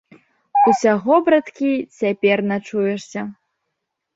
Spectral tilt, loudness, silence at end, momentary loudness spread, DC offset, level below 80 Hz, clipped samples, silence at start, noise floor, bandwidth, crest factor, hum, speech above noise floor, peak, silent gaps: -6 dB/octave; -18 LUFS; 0.85 s; 12 LU; under 0.1%; -64 dBFS; under 0.1%; 0.55 s; -78 dBFS; 8 kHz; 16 dB; none; 59 dB; -2 dBFS; none